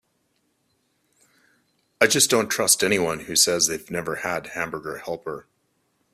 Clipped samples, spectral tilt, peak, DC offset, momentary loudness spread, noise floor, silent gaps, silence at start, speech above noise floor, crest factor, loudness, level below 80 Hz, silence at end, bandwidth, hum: under 0.1%; -1.5 dB/octave; -2 dBFS; under 0.1%; 14 LU; -70 dBFS; none; 2 s; 47 dB; 24 dB; -21 LUFS; -60 dBFS; 0.75 s; 16 kHz; none